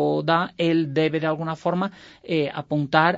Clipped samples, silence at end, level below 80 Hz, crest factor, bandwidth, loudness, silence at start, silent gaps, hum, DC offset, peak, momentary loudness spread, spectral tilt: under 0.1%; 0 s; -62 dBFS; 20 dB; 7.8 kHz; -23 LUFS; 0 s; none; none; under 0.1%; -2 dBFS; 6 LU; -7.5 dB/octave